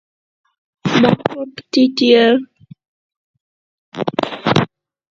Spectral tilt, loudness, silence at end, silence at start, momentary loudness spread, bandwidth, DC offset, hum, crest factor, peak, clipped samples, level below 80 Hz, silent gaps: -6 dB/octave; -15 LUFS; 0.45 s; 0.85 s; 15 LU; 7.6 kHz; under 0.1%; none; 18 dB; 0 dBFS; under 0.1%; -52 dBFS; 2.88-3.10 s, 3.17-3.34 s, 3.40-3.92 s